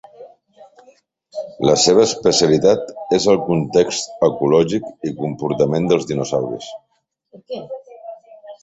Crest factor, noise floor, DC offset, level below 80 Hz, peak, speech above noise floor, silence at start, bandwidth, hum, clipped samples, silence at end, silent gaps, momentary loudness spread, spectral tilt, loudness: 18 dB; -53 dBFS; under 0.1%; -52 dBFS; 0 dBFS; 36 dB; 0.2 s; 8.2 kHz; none; under 0.1%; 0.05 s; none; 19 LU; -4.5 dB/octave; -17 LUFS